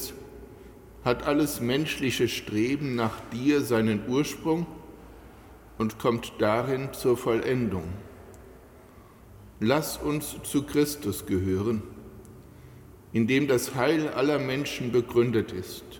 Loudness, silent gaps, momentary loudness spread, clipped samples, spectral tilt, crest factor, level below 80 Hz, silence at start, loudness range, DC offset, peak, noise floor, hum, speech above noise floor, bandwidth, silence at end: -27 LUFS; none; 17 LU; under 0.1%; -5.5 dB/octave; 18 dB; -52 dBFS; 0 s; 4 LU; under 0.1%; -10 dBFS; -51 dBFS; none; 24 dB; 17.5 kHz; 0 s